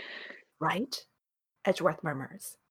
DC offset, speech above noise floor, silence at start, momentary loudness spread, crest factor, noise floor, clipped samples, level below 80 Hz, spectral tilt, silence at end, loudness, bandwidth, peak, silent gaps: under 0.1%; 52 dB; 0 s; 15 LU; 22 dB; -84 dBFS; under 0.1%; -74 dBFS; -4.5 dB/octave; 0.15 s; -33 LUFS; 18 kHz; -12 dBFS; none